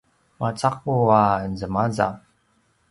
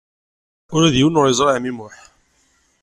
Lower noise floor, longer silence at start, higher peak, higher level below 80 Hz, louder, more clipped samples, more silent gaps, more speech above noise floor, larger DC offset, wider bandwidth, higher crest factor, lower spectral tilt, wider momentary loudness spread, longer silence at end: first, -65 dBFS vs -61 dBFS; second, 0.4 s vs 0.7 s; about the same, -4 dBFS vs -4 dBFS; about the same, -50 dBFS vs -48 dBFS; second, -22 LUFS vs -16 LUFS; neither; neither; about the same, 44 dB vs 45 dB; neither; about the same, 11.5 kHz vs 12 kHz; about the same, 20 dB vs 16 dB; first, -7 dB/octave vs -5 dB/octave; about the same, 11 LU vs 13 LU; second, 0.75 s vs 0.95 s